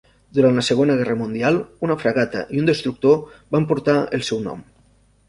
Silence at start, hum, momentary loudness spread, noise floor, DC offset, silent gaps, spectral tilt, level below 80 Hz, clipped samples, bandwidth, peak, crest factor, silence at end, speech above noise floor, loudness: 0.35 s; none; 7 LU; -56 dBFS; under 0.1%; none; -6 dB/octave; -54 dBFS; under 0.1%; 11.5 kHz; -2 dBFS; 18 dB; 0.65 s; 37 dB; -20 LUFS